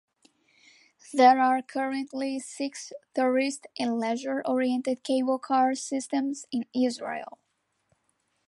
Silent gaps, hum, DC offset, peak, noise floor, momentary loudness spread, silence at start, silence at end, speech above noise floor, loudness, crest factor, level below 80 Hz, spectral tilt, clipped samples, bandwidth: none; none; under 0.1%; -6 dBFS; -74 dBFS; 13 LU; 1.05 s; 1.2 s; 47 dB; -27 LUFS; 20 dB; -82 dBFS; -3 dB/octave; under 0.1%; 11.5 kHz